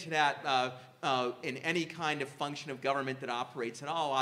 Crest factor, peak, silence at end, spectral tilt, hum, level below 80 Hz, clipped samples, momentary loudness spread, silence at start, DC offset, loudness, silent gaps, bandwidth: 20 dB; -14 dBFS; 0 s; -4 dB/octave; none; -86 dBFS; under 0.1%; 8 LU; 0 s; under 0.1%; -34 LUFS; none; 15 kHz